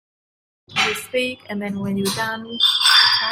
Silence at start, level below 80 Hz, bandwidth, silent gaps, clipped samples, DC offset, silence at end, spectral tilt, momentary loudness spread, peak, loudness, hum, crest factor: 0.7 s; -62 dBFS; 16 kHz; none; under 0.1%; under 0.1%; 0 s; -2 dB/octave; 14 LU; -2 dBFS; -17 LUFS; none; 18 dB